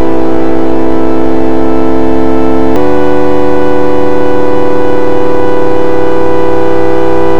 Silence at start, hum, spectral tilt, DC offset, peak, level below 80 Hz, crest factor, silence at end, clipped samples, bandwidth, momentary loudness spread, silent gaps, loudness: 0 s; none; -7.5 dB/octave; 70%; 0 dBFS; -30 dBFS; 14 dB; 0 s; under 0.1%; 12 kHz; 1 LU; none; -10 LUFS